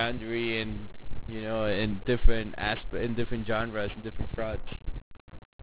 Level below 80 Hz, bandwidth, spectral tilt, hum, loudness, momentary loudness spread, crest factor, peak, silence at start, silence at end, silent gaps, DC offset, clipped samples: -36 dBFS; 4 kHz; -9.5 dB/octave; none; -32 LUFS; 13 LU; 22 dB; -6 dBFS; 0 s; 0 s; 5.02-5.11 s, 5.20-5.28 s, 5.45-5.59 s; 0.4%; under 0.1%